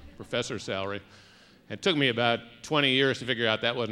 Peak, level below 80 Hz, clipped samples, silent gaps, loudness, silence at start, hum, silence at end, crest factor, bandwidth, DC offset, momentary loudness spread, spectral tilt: -8 dBFS; -62 dBFS; under 0.1%; none; -27 LUFS; 0 s; none; 0 s; 20 dB; 12.5 kHz; under 0.1%; 10 LU; -4.5 dB/octave